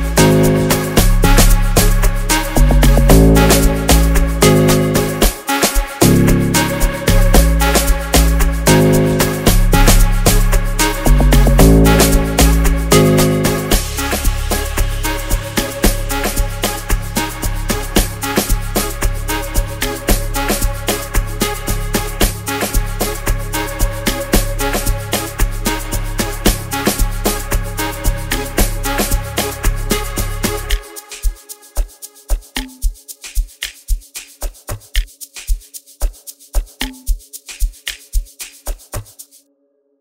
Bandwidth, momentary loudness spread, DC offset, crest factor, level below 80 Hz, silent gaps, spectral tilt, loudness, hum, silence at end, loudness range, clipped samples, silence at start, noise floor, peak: 16.5 kHz; 15 LU; 0.1%; 14 dB; -16 dBFS; none; -4.5 dB/octave; -15 LUFS; none; 0.8 s; 14 LU; under 0.1%; 0 s; -61 dBFS; 0 dBFS